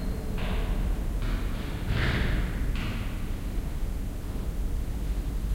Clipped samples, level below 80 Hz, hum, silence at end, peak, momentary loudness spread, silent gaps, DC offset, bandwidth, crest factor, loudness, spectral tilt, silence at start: under 0.1%; -30 dBFS; none; 0 s; -14 dBFS; 7 LU; none; under 0.1%; 16 kHz; 14 dB; -32 LUFS; -6 dB/octave; 0 s